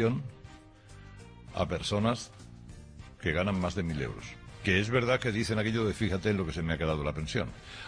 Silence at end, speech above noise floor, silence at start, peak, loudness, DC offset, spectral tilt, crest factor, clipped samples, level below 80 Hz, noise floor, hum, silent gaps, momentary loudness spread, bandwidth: 0 s; 21 dB; 0 s; -12 dBFS; -31 LUFS; under 0.1%; -6 dB/octave; 20 dB; under 0.1%; -48 dBFS; -52 dBFS; none; none; 22 LU; 10.5 kHz